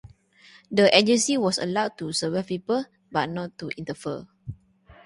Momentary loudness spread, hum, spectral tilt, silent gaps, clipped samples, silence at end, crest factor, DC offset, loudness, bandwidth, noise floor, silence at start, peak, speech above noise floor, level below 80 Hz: 16 LU; none; -3.5 dB/octave; none; under 0.1%; 0.1 s; 22 dB; under 0.1%; -24 LUFS; 11.5 kHz; -54 dBFS; 0.05 s; -2 dBFS; 30 dB; -60 dBFS